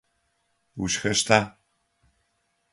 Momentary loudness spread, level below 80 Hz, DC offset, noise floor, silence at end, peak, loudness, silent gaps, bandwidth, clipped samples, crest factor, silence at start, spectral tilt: 17 LU; -56 dBFS; under 0.1%; -73 dBFS; 1.25 s; -2 dBFS; -23 LUFS; none; 11.5 kHz; under 0.1%; 26 dB; 0.75 s; -3 dB/octave